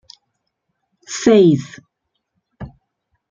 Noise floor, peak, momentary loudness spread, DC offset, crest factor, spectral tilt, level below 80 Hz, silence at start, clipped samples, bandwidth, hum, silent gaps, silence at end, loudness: -74 dBFS; -2 dBFS; 26 LU; under 0.1%; 18 dB; -6 dB/octave; -54 dBFS; 1.1 s; under 0.1%; 9.2 kHz; none; none; 0.65 s; -14 LUFS